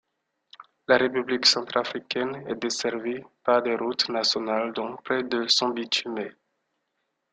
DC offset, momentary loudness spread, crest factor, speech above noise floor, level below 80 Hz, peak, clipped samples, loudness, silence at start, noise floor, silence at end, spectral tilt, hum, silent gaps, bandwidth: under 0.1%; 12 LU; 22 dB; 52 dB; -70 dBFS; -6 dBFS; under 0.1%; -25 LUFS; 0.6 s; -78 dBFS; 1 s; -2.5 dB/octave; none; none; 9.4 kHz